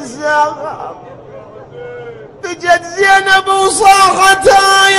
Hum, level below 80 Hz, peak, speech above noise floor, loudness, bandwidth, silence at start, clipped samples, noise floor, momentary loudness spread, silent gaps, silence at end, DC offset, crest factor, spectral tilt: none; -44 dBFS; 0 dBFS; 23 dB; -9 LUFS; 16 kHz; 0 s; under 0.1%; -32 dBFS; 21 LU; none; 0 s; under 0.1%; 12 dB; -1 dB/octave